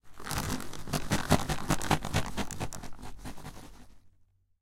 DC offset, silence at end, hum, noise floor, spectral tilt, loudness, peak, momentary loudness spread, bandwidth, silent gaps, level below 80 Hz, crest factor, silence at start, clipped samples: under 0.1%; 0.5 s; none; -65 dBFS; -4.5 dB/octave; -32 LUFS; -8 dBFS; 18 LU; 17 kHz; none; -44 dBFS; 26 dB; 0.05 s; under 0.1%